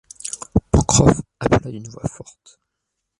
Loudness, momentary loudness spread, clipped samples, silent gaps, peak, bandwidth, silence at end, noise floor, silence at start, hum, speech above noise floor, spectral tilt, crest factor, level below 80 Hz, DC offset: -19 LUFS; 16 LU; under 0.1%; none; -2 dBFS; 11.5 kHz; 1.1 s; -78 dBFS; 0.25 s; none; 59 dB; -5 dB/octave; 18 dB; -32 dBFS; under 0.1%